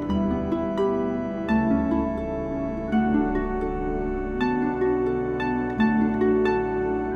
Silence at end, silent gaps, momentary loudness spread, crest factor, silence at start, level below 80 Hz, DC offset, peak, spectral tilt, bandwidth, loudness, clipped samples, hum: 0 s; none; 6 LU; 14 dB; 0 s; -38 dBFS; under 0.1%; -10 dBFS; -8.5 dB/octave; 6.6 kHz; -24 LUFS; under 0.1%; none